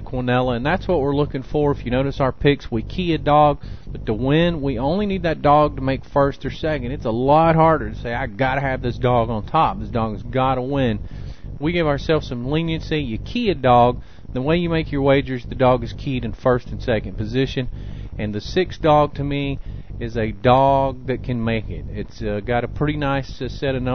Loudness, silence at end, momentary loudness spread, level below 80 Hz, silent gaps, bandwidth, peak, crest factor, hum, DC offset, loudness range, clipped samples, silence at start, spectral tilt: -20 LUFS; 0 s; 12 LU; -34 dBFS; none; 6.6 kHz; -2 dBFS; 18 dB; none; 1%; 3 LU; under 0.1%; 0 s; -8 dB/octave